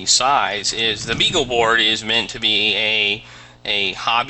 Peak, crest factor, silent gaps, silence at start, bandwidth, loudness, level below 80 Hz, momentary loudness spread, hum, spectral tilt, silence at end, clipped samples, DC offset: -2 dBFS; 16 dB; none; 0 s; 9 kHz; -17 LUFS; -46 dBFS; 5 LU; none; -1 dB/octave; 0 s; under 0.1%; under 0.1%